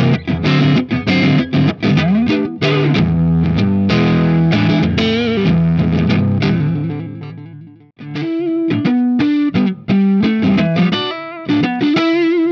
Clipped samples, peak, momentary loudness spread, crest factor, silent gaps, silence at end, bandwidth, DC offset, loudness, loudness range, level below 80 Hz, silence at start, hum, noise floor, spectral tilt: under 0.1%; -2 dBFS; 7 LU; 12 dB; none; 0 s; 6.6 kHz; under 0.1%; -14 LUFS; 4 LU; -38 dBFS; 0 s; none; -37 dBFS; -8 dB/octave